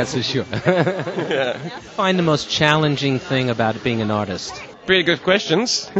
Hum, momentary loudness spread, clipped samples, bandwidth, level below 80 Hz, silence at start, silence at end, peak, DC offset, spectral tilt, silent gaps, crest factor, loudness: none; 9 LU; under 0.1%; 8.4 kHz; -52 dBFS; 0 s; 0 s; 0 dBFS; under 0.1%; -4.5 dB/octave; none; 20 dB; -19 LUFS